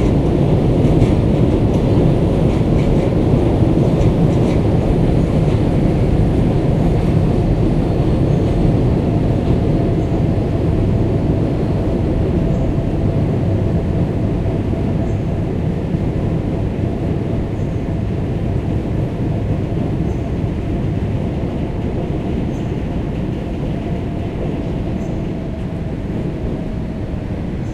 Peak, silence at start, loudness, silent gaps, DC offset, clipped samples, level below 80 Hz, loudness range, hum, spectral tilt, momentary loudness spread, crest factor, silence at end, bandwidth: 0 dBFS; 0 s; -17 LUFS; none; under 0.1%; under 0.1%; -24 dBFS; 7 LU; none; -9 dB/octave; 8 LU; 14 dB; 0 s; 11 kHz